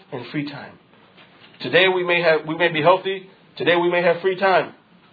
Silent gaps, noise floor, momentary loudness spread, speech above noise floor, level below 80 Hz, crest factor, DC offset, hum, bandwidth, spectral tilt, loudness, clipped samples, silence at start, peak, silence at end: none; -50 dBFS; 15 LU; 31 dB; -72 dBFS; 18 dB; under 0.1%; none; 5 kHz; -7.5 dB/octave; -19 LUFS; under 0.1%; 0.1 s; -2 dBFS; 0.4 s